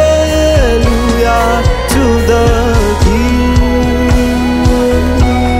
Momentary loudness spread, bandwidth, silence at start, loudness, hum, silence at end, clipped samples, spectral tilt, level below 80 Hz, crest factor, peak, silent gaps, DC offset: 2 LU; 16 kHz; 0 s; -10 LUFS; none; 0 s; under 0.1%; -6 dB/octave; -14 dBFS; 8 dB; 0 dBFS; none; under 0.1%